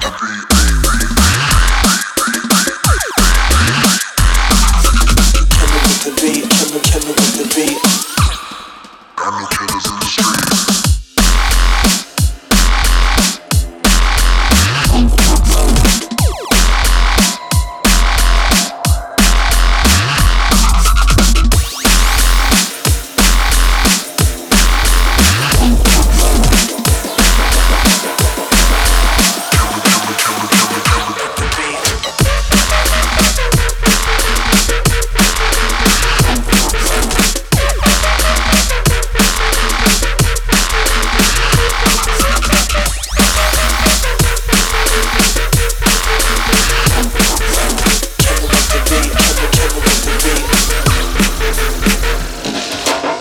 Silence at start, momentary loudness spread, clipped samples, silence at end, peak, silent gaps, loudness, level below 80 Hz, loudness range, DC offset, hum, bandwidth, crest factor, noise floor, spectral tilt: 0 s; 4 LU; under 0.1%; 0 s; 0 dBFS; none; -12 LUFS; -14 dBFS; 2 LU; under 0.1%; none; 18.5 kHz; 12 dB; -35 dBFS; -3 dB/octave